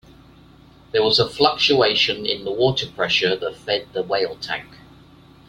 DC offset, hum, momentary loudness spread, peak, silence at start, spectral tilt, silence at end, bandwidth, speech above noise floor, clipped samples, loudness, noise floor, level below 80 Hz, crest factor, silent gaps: under 0.1%; none; 9 LU; 0 dBFS; 0.95 s; -4 dB/octave; 0.75 s; 13 kHz; 28 dB; under 0.1%; -19 LUFS; -48 dBFS; -54 dBFS; 22 dB; none